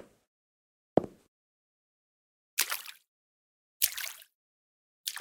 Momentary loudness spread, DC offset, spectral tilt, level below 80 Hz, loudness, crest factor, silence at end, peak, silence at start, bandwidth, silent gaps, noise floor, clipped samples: 18 LU; under 0.1%; -2 dB/octave; -70 dBFS; -32 LUFS; 34 dB; 0 s; -4 dBFS; 0 s; 19 kHz; 0.27-0.96 s, 1.28-2.57 s, 3.07-3.80 s, 4.34-5.04 s; under -90 dBFS; under 0.1%